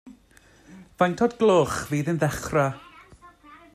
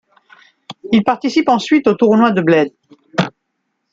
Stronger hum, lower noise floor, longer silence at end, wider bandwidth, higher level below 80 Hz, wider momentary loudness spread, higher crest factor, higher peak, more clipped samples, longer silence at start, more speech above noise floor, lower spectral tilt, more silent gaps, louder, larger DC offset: neither; second, -56 dBFS vs -71 dBFS; second, 0.2 s vs 0.65 s; first, 14.5 kHz vs 7.8 kHz; first, -52 dBFS vs -58 dBFS; second, 7 LU vs 11 LU; first, 20 dB vs 14 dB; second, -6 dBFS vs -2 dBFS; neither; second, 0.05 s vs 0.7 s; second, 33 dB vs 58 dB; about the same, -6 dB/octave vs -6.5 dB/octave; neither; second, -23 LUFS vs -14 LUFS; neither